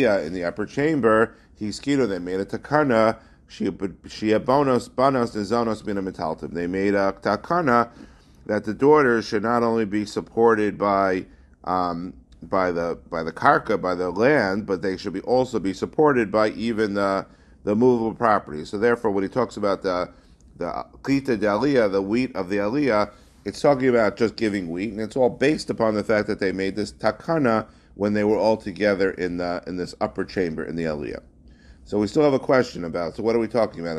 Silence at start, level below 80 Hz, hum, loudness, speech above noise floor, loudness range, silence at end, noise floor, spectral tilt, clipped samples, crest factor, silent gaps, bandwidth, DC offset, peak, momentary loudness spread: 0 s; -50 dBFS; none; -23 LUFS; 27 dB; 3 LU; 0 s; -49 dBFS; -6.5 dB/octave; under 0.1%; 22 dB; none; 12 kHz; under 0.1%; 0 dBFS; 10 LU